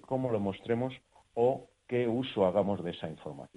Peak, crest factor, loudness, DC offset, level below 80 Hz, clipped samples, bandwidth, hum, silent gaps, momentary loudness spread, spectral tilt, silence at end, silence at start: -14 dBFS; 18 dB; -32 LUFS; under 0.1%; -66 dBFS; under 0.1%; 10.5 kHz; none; none; 13 LU; -8 dB/octave; 0.1 s; 0.1 s